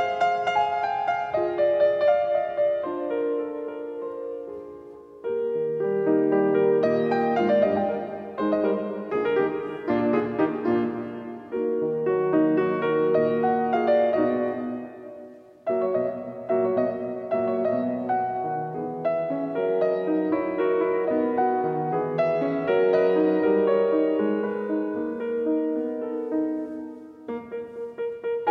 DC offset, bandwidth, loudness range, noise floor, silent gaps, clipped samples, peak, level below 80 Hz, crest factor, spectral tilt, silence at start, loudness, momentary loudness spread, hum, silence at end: under 0.1%; 6.2 kHz; 5 LU; -45 dBFS; none; under 0.1%; -10 dBFS; -66 dBFS; 14 dB; -8 dB/octave; 0 s; -25 LUFS; 13 LU; none; 0 s